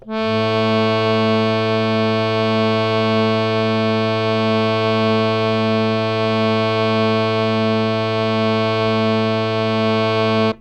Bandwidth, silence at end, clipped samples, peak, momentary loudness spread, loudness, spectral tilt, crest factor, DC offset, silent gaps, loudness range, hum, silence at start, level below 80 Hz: 8.6 kHz; 0.05 s; under 0.1%; -4 dBFS; 2 LU; -17 LUFS; -7 dB/octave; 14 dB; under 0.1%; none; 1 LU; none; 0.05 s; -50 dBFS